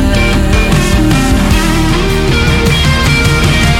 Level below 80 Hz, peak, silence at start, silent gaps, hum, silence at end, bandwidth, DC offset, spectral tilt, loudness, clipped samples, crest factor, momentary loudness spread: -14 dBFS; 0 dBFS; 0 s; none; none; 0 s; 16.5 kHz; under 0.1%; -5 dB/octave; -10 LUFS; under 0.1%; 8 dB; 2 LU